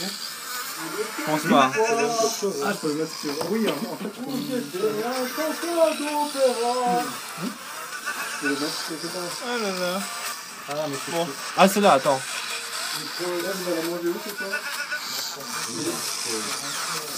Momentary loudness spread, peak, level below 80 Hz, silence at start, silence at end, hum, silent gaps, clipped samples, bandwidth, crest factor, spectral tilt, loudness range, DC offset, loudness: 10 LU; 0 dBFS; -84 dBFS; 0 s; 0 s; none; none; under 0.1%; 15.5 kHz; 26 dB; -3 dB/octave; 5 LU; under 0.1%; -25 LUFS